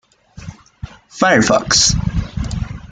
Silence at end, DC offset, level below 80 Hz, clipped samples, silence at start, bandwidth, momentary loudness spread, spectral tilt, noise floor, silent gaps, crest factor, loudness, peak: 0.05 s; under 0.1%; -30 dBFS; under 0.1%; 0.35 s; 11 kHz; 24 LU; -3 dB/octave; -35 dBFS; none; 16 dB; -15 LUFS; -2 dBFS